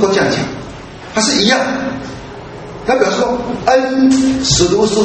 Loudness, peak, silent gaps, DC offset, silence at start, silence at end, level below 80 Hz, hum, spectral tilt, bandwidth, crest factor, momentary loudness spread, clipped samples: -13 LUFS; 0 dBFS; none; under 0.1%; 0 s; 0 s; -38 dBFS; none; -3.5 dB/octave; 8.8 kHz; 14 dB; 18 LU; under 0.1%